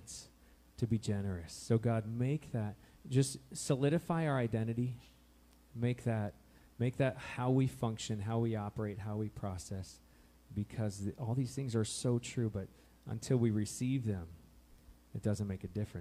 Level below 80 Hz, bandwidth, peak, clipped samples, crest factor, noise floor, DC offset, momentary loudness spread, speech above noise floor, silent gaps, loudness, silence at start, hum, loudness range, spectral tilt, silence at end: -62 dBFS; 15 kHz; -18 dBFS; under 0.1%; 18 dB; -64 dBFS; under 0.1%; 12 LU; 28 dB; none; -37 LUFS; 0 s; none; 4 LU; -6.5 dB/octave; 0 s